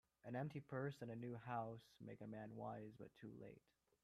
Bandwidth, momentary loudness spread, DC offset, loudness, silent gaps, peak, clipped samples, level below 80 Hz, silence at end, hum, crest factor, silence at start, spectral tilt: 14.5 kHz; 11 LU; under 0.1%; -53 LUFS; none; -34 dBFS; under 0.1%; -84 dBFS; 0.45 s; none; 18 dB; 0.25 s; -8 dB/octave